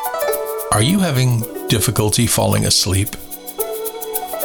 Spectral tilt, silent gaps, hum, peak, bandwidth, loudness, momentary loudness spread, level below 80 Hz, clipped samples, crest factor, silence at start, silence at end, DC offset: -4 dB/octave; none; none; -4 dBFS; over 20 kHz; -17 LUFS; 10 LU; -40 dBFS; under 0.1%; 14 dB; 0 s; 0 s; under 0.1%